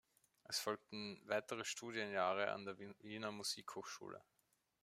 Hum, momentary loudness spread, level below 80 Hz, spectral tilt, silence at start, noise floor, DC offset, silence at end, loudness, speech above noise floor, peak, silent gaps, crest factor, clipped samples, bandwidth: none; 12 LU; -88 dBFS; -2.5 dB/octave; 0.5 s; -83 dBFS; under 0.1%; 0.6 s; -45 LUFS; 38 dB; -24 dBFS; none; 22 dB; under 0.1%; 16 kHz